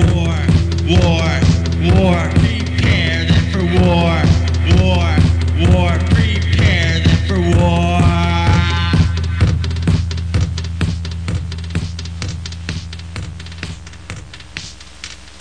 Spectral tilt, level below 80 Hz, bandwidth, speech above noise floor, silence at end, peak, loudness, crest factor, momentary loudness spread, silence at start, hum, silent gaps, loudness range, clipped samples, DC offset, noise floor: -6.5 dB/octave; -22 dBFS; 9.8 kHz; 22 dB; 0.1 s; 0 dBFS; -15 LUFS; 14 dB; 16 LU; 0 s; none; none; 12 LU; under 0.1%; 0.9%; -34 dBFS